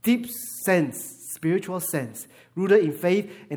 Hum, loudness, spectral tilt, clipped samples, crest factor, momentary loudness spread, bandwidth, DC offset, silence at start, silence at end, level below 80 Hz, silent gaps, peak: none; -24 LUFS; -5.5 dB/octave; under 0.1%; 18 dB; 15 LU; over 20 kHz; under 0.1%; 0.05 s; 0 s; -72 dBFS; none; -6 dBFS